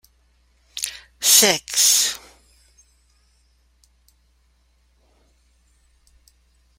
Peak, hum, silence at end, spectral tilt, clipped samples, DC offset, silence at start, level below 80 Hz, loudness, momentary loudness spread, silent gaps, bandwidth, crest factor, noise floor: 0 dBFS; none; 4.6 s; 0.5 dB/octave; under 0.1%; under 0.1%; 0.75 s; -60 dBFS; -16 LUFS; 19 LU; none; 16.5 kHz; 24 dB; -61 dBFS